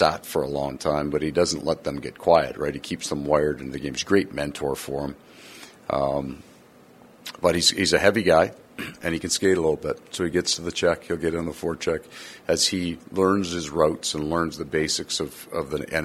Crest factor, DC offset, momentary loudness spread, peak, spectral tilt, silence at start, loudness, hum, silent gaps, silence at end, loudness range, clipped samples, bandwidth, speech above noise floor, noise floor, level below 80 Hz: 22 dB; under 0.1%; 12 LU; -2 dBFS; -3.5 dB/octave; 0 s; -24 LUFS; none; none; 0 s; 5 LU; under 0.1%; 15.5 kHz; 27 dB; -51 dBFS; -50 dBFS